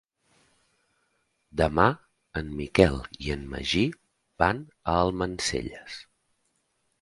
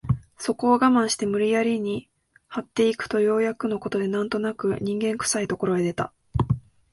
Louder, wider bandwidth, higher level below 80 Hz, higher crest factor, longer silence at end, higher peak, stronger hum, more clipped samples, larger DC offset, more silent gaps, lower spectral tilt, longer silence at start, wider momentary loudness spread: second, -27 LUFS vs -24 LUFS; about the same, 11.5 kHz vs 11.5 kHz; about the same, -44 dBFS vs -46 dBFS; first, 26 dB vs 18 dB; first, 1 s vs 0.35 s; first, -2 dBFS vs -6 dBFS; neither; neither; neither; neither; about the same, -5 dB/octave vs -5.5 dB/octave; first, 1.55 s vs 0.05 s; first, 15 LU vs 10 LU